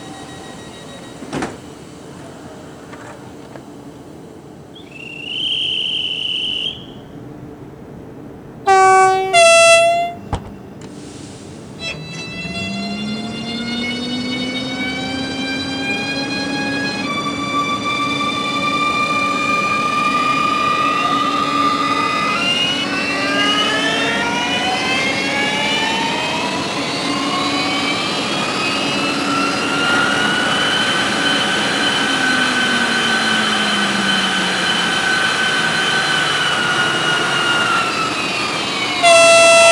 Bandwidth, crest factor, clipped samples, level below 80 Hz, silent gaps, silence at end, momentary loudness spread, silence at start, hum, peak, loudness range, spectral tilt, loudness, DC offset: 20 kHz; 18 dB; under 0.1%; -50 dBFS; none; 0 s; 20 LU; 0 s; none; 0 dBFS; 12 LU; -2.5 dB/octave; -15 LUFS; under 0.1%